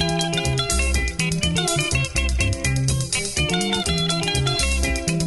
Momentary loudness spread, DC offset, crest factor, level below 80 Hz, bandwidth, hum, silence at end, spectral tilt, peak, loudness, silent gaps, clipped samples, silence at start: 2 LU; under 0.1%; 14 dB; -28 dBFS; 12 kHz; none; 0 s; -3.5 dB/octave; -6 dBFS; -21 LUFS; none; under 0.1%; 0 s